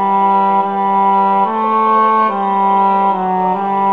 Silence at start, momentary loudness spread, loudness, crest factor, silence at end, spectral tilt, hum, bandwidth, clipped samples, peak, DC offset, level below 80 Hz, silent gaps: 0 s; 4 LU; -13 LUFS; 12 dB; 0 s; -8.5 dB/octave; none; 4.9 kHz; under 0.1%; -2 dBFS; 0.4%; -68 dBFS; none